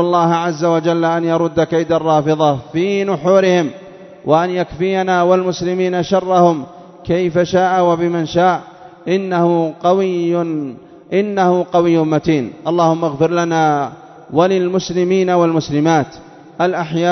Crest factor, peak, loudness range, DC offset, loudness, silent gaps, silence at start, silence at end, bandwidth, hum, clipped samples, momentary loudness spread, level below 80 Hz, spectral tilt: 14 dB; 0 dBFS; 1 LU; under 0.1%; -15 LUFS; none; 0 s; 0 s; 6.4 kHz; none; under 0.1%; 7 LU; -52 dBFS; -6.5 dB/octave